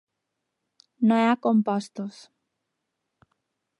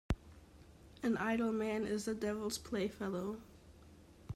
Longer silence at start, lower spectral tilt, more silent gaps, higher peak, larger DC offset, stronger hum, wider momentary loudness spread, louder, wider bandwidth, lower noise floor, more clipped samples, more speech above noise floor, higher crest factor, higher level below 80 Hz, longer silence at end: first, 1 s vs 0.1 s; first, -7 dB/octave vs -5.5 dB/octave; neither; first, -8 dBFS vs -22 dBFS; neither; neither; first, 16 LU vs 10 LU; first, -23 LUFS vs -39 LUFS; second, 11 kHz vs 15.5 kHz; first, -82 dBFS vs -60 dBFS; neither; first, 59 dB vs 22 dB; about the same, 18 dB vs 18 dB; second, -80 dBFS vs -54 dBFS; first, 1.7 s vs 0 s